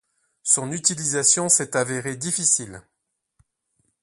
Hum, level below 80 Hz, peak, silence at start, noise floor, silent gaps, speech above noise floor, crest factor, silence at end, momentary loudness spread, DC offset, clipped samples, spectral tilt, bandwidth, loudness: none; -64 dBFS; -2 dBFS; 0.45 s; -71 dBFS; none; 49 dB; 22 dB; 1.25 s; 9 LU; under 0.1%; under 0.1%; -2 dB/octave; 12 kHz; -20 LUFS